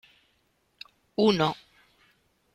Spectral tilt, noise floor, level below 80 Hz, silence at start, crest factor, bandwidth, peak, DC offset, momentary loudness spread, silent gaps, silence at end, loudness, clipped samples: -6 dB/octave; -71 dBFS; -64 dBFS; 1.2 s; 20 dB; 13.5 kHz; -10 dBFS; under 0.1%; 25 LU; none; 1 s; -26 LUFS; under 0.1%